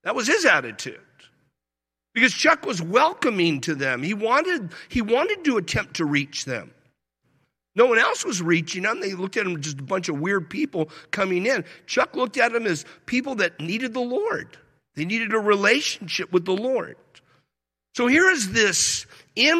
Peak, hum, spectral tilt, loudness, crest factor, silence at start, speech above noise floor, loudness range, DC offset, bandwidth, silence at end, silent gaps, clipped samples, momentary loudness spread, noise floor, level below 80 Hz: -4 dBFS; none; -3.5 dB/octave; -22 LUFS; 20 dB; 0.05 s; 65 dB; 4 LU; under 0.1%; 14.5 kHz; 0 s; none; under 0.1%; 11 LU; -87 dBFS; -56 dBFS